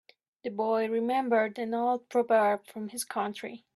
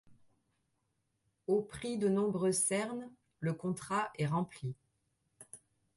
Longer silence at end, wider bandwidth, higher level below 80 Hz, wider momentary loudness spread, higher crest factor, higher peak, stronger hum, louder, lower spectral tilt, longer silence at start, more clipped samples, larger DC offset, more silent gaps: second, 0.2 s vs 0.4 s; first, 13.5 kHz vs 12 kHz; second, -80 dBFS vs -70 dBFS; second, 13 LU vs 22 LU; about the same, 16 dB vs 16 dB; first, -14 dBFS vs -20 dBFS; neither; first, -29 LUFS vs -35 LUFS; about the same, -4 dB/octave vs -5 dB/octave; first, 0.45 s vs 0.1 s; neither; neither; neither